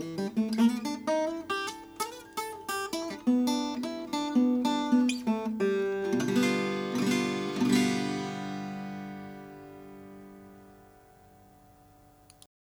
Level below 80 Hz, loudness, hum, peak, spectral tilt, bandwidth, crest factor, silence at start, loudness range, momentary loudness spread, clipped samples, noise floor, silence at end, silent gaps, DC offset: -68 dBFS; -30 LUFS; none; -12 dBFS; -5 dB/octave; over 20 kHz; 18 dB; 0 s; 14 LU; 18 LU; under 0.1%; -58 dBFS; 2 s; none; under 0.1%